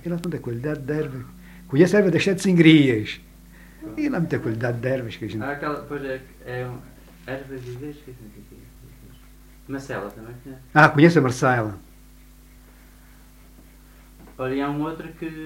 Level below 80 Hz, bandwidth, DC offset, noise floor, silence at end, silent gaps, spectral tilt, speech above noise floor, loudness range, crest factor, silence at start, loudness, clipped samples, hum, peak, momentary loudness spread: -50 dBFS; 16 kHz; under 0.1%; -48 dBFS; 0 s; none; -6.5 dB/octave; 27 dB; 17 LU; 24 dB; 0.05 s; -21 LUFS; under 0.1%; none; 0 dBFS; 22 LU